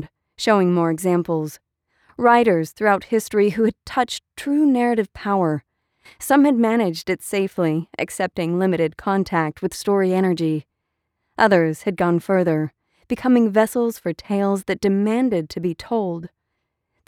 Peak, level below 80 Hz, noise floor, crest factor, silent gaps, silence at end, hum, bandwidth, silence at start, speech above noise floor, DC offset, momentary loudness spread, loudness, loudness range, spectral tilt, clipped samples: -4 dBFS; -56 dBFS; -77 dBFS; 16 dB; none; 0.8 s; none; 17 kHz; 0 s; 57 dB; under 0.1%; 10 LU; -20 LUFS; 2 LU; -6 dB/octave; under 0.1%